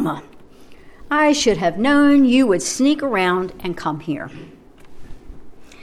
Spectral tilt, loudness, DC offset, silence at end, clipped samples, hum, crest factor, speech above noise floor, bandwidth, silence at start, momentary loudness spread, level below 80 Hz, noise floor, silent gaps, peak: -4 dB/octave; -17 LUFS; under 0.1%; 0 s; under 0.1%; none; 14 dB; 24 dB; 13.5 kHz; 0 s; 14 LU; -44 dBFS; -41 dBFS; none; -4 dBFS